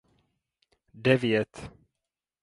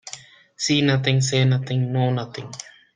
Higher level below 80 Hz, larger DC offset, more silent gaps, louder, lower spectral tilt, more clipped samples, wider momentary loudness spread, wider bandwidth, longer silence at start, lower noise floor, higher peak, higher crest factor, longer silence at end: about the same, -60 dBFS vs -60 dBFS; neither; neither; second, -26 LUFS vs -21 LUFS; first, -6.5 dB/octave vs -5 dB/octave; neither; first, 22 LU vs 18 LU; first, 11.5 kHz vs 9.8 kHz; first, 0.95 s vs 0.05 s; first, -88 dBFS vs -43 dBFS; second, -6 dBFS vs -2 dBFS; about the same, 24 dB vs 20 dB; first, 0.75 s vs 0.35 s